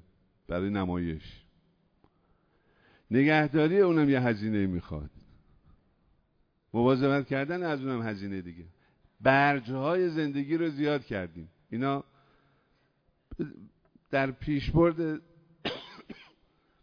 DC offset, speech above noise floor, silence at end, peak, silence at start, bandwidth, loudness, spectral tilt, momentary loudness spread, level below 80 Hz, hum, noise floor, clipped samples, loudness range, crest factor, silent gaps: under 0.1%; 43 dB; 0.6 s; -8 dBFS; 0.5 s; 5.4 kHz; -29 LUFS; -8.5 dB/octave; 18 LU; -52 dBFS; none; -71 dBFS; under 0.1%; 7 LU; 22 dB; none